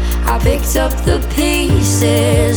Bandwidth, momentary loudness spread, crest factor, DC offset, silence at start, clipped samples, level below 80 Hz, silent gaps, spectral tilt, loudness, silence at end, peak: over 20 kHz; 4 LU; 12 dB; under 0.1%; 0 s; under 0.1%; -18 dBFS; none; -5 dB/octave; -14 LUFS; 0 s; 0 dBFS